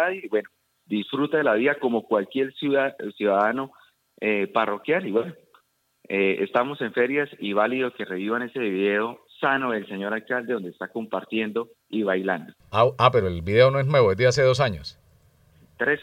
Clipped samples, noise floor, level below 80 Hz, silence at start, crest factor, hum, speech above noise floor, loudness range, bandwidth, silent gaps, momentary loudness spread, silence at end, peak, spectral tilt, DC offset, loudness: under 0.1%; -62 dBFS; -60 dBFS; 0 s; 20 dB; none; 39 dB; 5 LU; 15 kHz; none; 11 LU; 0 s; -4 dBFS; -6 dB/octave; under 0.1%; -24 LUFS